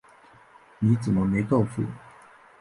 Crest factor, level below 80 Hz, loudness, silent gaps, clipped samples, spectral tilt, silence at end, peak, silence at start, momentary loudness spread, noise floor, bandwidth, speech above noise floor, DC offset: 16 dB; -52 dBFS; -25 LUFS; none; under 0.1%; -9 dB/octave; 0.65 s; -10 dBFS; 0.8 s; 10 LU; -54 dBFS; 11.5 kHz; 30 dB; under 0.1%